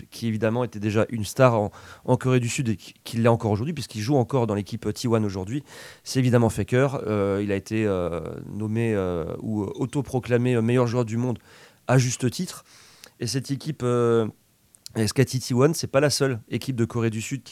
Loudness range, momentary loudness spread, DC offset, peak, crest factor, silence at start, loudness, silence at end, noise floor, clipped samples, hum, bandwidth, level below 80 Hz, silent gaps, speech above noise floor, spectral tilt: 3 LU; 11 LU; under 0.1%; -4 dBFS; 20 dB; 0.1 s; -24 LUFS; 0 s; -49 dBFS; under 0.1%; none; 16 kHz; -50 dBFS; none; 26 dB; -6 dB/octave